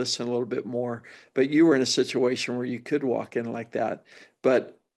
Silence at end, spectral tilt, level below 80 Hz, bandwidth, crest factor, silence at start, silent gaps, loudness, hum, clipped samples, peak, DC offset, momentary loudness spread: 0.25 s; -4.5 dB/octave; -82 dBFS; 12 kHz; 18 dB; 0 s; none; -26 LUFS; none; under 0.1%; -8 dBFS; under 0.1%; 12 LU